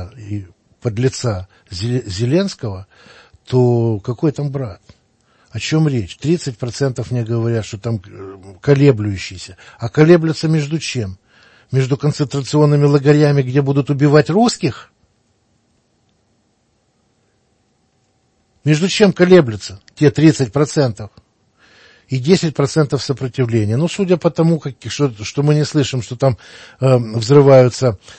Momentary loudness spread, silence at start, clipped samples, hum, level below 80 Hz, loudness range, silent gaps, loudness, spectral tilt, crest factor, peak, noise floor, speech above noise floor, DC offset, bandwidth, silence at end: 16 LU; 0 s; under 0.1%; none; -50 dBFS; 6 LU; none; -15 LUFS; -6.5 dB/octave; 16 dB; 0 dBFS; -62 dBFS; 47 dB; under 0.1%; 8.8 kHz; 0.05 s